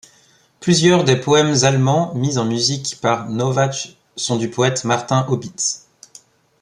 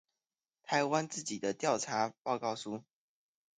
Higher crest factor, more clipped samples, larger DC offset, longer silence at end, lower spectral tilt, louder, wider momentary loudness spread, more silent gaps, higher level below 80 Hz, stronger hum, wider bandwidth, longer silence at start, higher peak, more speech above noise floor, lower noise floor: about the same, 18 dB vs 20 dB; neither; neither; about the same, 0.85 s vs 0.8 s; about the same, -4.5 dB/octave vs -3.5 dB/octave; first, -17 LUFS vs -35 LUFS; about the same, 9 LU vs 11 LU; second, none vs 2.18-2.25 s; first, -56 dBFS vs -82 dBFS; neither; first, 11.5 kHz vs 9.6 kHz; about the same, 0.6 s vs 0.65 s; first, -2 dBFS vs -16 dBFS; second, 37 dB vs over 55 dB; second, -54 dBFS vs under -90 dBFS